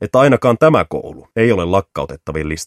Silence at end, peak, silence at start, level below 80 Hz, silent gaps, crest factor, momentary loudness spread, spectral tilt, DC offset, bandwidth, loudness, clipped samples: 0 s; 0 dBFS; 0 s; -38 dBFS; none; 14 dB; 14 LU; -6.5 dB/octave; under 0.1%; 14 kHz; -15 LUFS; under 0.1%